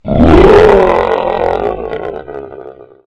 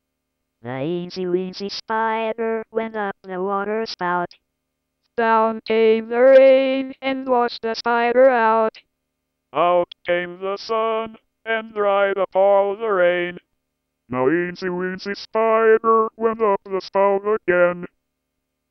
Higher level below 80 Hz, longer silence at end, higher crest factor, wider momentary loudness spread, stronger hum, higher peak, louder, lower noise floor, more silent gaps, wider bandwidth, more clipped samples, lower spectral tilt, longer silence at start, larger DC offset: first, -22 dBFS vs -64 dBFS; second, 0.3 s vs 0.85 s; second, 10 dB vs 16 dB; first, 21 LU vs 13 LU; neither; first, 0 dBFS vs -4 dBFS; first, -8 LUFS vs -19 LUFS; second, -32 dBFS vs -77 dBFS; neither; first, 9.2 kHz vs 6.2 kHz; first, 3% vs under 0.1%; first, -8 dB/octave vs -6.5 dB/octave; second, 0.05 s vs 0.65 s; neither